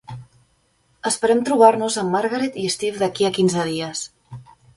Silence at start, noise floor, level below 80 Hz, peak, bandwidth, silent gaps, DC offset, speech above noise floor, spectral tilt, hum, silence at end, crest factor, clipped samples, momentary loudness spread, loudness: 0.1 s; -63 dBFS; -60 dBFS; 0 dBFS; 11.5 kHz; none; under 0.1%; 44 dB; -4 dB/octave; none; 0.35 s; 20 dB; under 0.1%; 15 LU; -20 LUFS